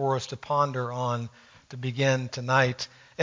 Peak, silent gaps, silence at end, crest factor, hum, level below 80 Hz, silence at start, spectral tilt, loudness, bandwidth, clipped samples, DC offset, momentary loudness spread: -8 dBFS; none; 0 s; 20 dB; none; -64 dBFS; 0 s; -5 dB/octave; -27 LUFS; 7.6 kHz; under 0.1%; under 0.1%; 13 LU